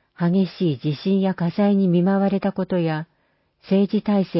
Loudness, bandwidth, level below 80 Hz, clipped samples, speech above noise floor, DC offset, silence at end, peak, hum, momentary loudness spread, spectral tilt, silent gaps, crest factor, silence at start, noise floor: -21 LUFS; 5.8 kHz; -62 dBFS; under 0.1%; 46 dB; under 0.1%; 0 s; -10 dBFS; none; 6 LU; -12.5 dB/octave; none; 12 dB; 0.2 s; -66 dBFS